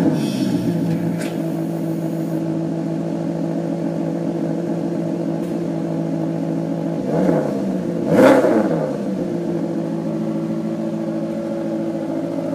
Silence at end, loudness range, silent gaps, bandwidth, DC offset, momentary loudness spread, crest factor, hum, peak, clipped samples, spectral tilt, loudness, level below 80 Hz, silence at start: 0 s; 5 LU; none; 15.5 kHz; under 0.1%; 6 LU; 18 dB; none; -2 dBFS; under 0.1%; -8 dB/octave; -21 LUFS; -58 dBFS; 0 s